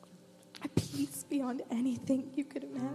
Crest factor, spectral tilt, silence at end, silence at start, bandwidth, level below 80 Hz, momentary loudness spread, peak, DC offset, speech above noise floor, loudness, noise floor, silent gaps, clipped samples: 22 dB; -6 dB/octave; 0 s; 0 s; 15 kHz; -66 dBFS; 6 LU; -14 dBFS; under 0.1%; 22 dB; -36 LUFS; -58 dBFS; none; under 0.1%